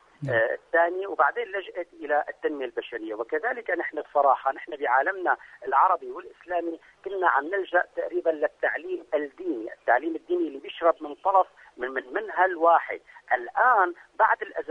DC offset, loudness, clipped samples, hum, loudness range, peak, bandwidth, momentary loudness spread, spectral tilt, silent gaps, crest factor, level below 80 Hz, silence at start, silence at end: under 0.1%; -26 LUFS; under 0.1%; none; 3 LU; -8 dBFS; 6.4 kHz; 11 LU; -7 dB/octave; none; 18 dB; -70 dBFS; 0.2 s; 0 s